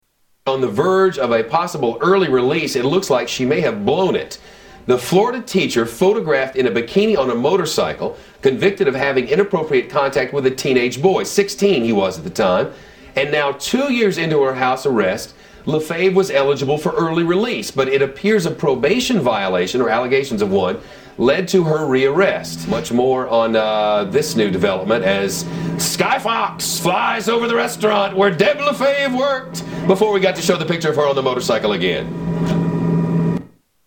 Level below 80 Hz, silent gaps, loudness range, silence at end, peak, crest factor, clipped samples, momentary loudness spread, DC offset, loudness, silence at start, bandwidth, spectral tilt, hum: -50 dBFS; none; 1 LU; 0.4 s; 0 dBFS; 16 dB; under 0.1%; 6 LU; under 0.1%; -17 LUFS; 0.45 s; 18 kHz; -5 dB/octave; none